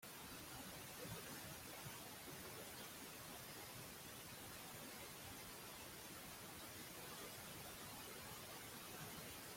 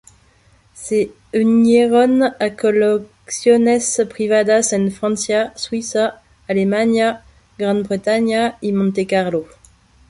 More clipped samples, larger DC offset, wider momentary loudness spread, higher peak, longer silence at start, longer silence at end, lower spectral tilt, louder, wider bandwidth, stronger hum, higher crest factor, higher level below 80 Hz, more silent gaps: neither; neither; second, 2 LU vs 9 LU; second, -40 dBFS vs -2 dBFS; second, 0 s vs 0.75 s; second, 0 s vs 0.65 s; second, -2.5 dB/octave vs -4.5 dB/octave; second, -53 LUFS vs -17 LUFS; first, 16.5 kHz vs 11.5 kHz; neither; about the same, 14 dB vs 14 dB; second, -74 dBFS vs -54 dBFS; neither